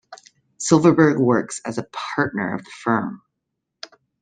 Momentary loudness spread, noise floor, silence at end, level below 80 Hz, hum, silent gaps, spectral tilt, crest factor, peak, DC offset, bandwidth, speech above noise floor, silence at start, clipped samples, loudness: 24 LU; -79 dBFS; 1.05 s; -60 dBFS; none; none; -5.5 dB/octave; 20 dB; -2 dBFS; under 0.1%; 9.6 kHz; 60 dB; 0.1 s; under 0.1%; -20 LUFS